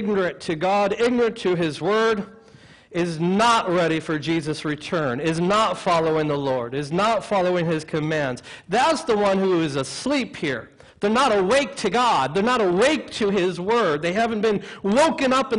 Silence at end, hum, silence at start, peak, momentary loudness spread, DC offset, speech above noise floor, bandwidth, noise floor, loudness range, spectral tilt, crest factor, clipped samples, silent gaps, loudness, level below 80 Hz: 0 s; none; 0 s; -6 dBFS; 7 LU; under 0.1%; 28 dB; 11 kHz; -49 dBFS; 2 LU; -5 dB/octave; 16 dB; under 0.1%; none; -21 LUFS; -54 dBFS